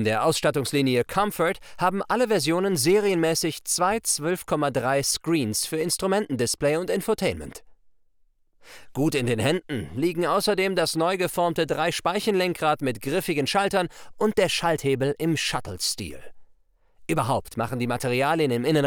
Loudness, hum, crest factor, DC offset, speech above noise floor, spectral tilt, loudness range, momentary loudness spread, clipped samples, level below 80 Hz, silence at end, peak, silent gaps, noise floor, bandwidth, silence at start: -24 LUFS; none; 18 dB; under 0.1%; 38 dB; -4 dB/octave; 4 LU; 5 LU; under 0.1%; -54 dBFS; 0 s; -8 dBFS; none; -62 dBFS; over 20 kHz; 0 s